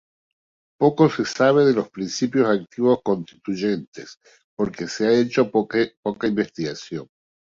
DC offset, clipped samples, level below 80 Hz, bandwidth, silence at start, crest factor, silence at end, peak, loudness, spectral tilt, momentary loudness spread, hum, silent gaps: under 0.1%; under 0.1%; -62 dBFS; 7.6 kHz; 0.8 s; 18 dB; 0.35 s; -4 dBFS; -21 LUFS; -6 dB/octave; 13 LU; none; 3.87-3.92 s, 4.44-4.57 s, 5.97-6.03 s